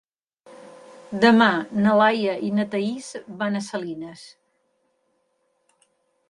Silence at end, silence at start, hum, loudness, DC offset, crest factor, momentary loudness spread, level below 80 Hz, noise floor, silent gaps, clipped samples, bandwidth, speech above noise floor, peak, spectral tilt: 2 s; 0.5 s; none; -21 LUFS; under 0.1%; 20 dB; 18 LU; -68 dBFS; -70 dBFS; none; under 0.1%; 11 kHz; 49 dB; -4 dBFS; -5.5 dB/octave